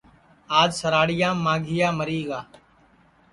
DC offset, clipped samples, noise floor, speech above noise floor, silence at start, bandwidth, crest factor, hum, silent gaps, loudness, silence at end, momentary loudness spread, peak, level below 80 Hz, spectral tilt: under 0.1%; under 0.1%; -57 dBFS; 35 dB; 0.5 s; 11.5 kHz; 20 dB; none; none; -22 LUFS; 0.9 s; 9 LU; -4 dBFS; -56 dBFS; -5 dB/octave